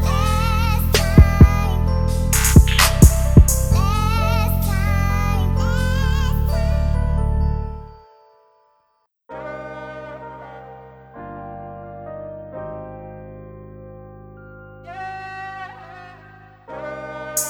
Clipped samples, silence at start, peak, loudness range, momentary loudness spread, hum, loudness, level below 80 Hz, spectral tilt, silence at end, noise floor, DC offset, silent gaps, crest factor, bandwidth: under 0.1%; 0 s; 0 dBFS; 21 LU; 25 LU; none; -17 LUFS; -22 dBFS; -5 dB/octave; 0 s; -66 dBFS; under 0.1%; none; 18 dB; 18.5 kHz